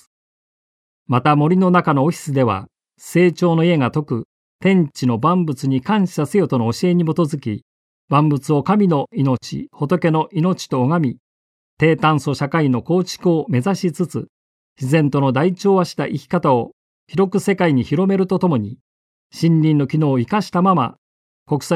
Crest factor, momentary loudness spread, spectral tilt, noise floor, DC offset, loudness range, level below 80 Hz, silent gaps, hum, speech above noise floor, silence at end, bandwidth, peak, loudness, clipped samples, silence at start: 16 dB; 9 LU; -7.5 dB/octave; under -90 dBFS; under 0.1%; 2 LU; -58 dBFS; 4.25-4.59 s, 7.62-8.08 s, 11.19-11.77 s, 14.29-14.76 s, 16.73-17.07 s, 18.81-19.30 s, 20.98-21.46 s; none; over 73 dB; 0 s; 13.5 kHz; -2 dBFS; -18 LUFS; under 0.1%; 1.1 s